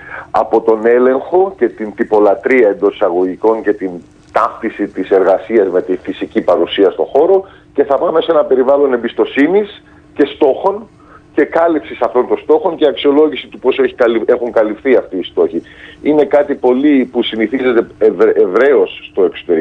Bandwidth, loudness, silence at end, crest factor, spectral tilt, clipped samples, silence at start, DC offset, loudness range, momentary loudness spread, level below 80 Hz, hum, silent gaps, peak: 6 kHz; -13 LUFS; 0 s; 12 dB; -7 dB/octave; under 0.1%; 0 s; under 0.1%; 2 LU; 8 LU; -50 dBFS; none; none; 0 dBFS